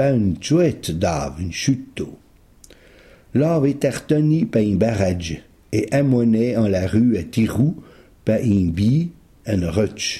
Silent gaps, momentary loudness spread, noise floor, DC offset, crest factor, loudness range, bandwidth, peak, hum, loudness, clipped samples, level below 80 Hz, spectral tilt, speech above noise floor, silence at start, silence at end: none; 10 LU; -49 dBFS; under 0.1%; 14 dB; 4 LU; 14.5 kHz; -4 dBFS; none; -20 LUFS; under 0.1%; -44 dBFS; -6.5 dB/octave; 31 dB; 0 s; 0 s